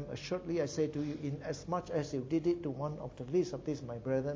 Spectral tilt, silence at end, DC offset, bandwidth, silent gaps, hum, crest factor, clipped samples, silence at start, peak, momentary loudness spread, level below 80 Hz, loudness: -6.5 dB/octave; 0 s; under 0.1%; 7.8 kHz; none; none; 16 dB; under 0.1%; 0 s; -20 dBFS; 6 LU; -60 dBFS; -37 LUFS